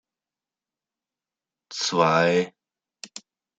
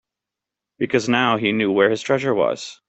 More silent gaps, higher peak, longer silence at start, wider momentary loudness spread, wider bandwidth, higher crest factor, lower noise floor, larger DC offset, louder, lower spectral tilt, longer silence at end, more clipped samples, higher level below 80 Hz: neither; about the same, -4 dBFS vs -2 dBFS; first, 1.7 s vs 0.8 s; first, 23 LU vs 5 LU; first, 9.4 kHz vs 8.4 kHz; about the same, 22 dB vs 18 dB; first, under -90 dBFS vs -86 dBFS; neither; second, -22 LUFS vs -19 LUFS; about the same, -4 dB/octave vs -5 dB/octave; first, 0.4 s vs 0.15 s; neither; second, -76 dBFS vs -62 dBFS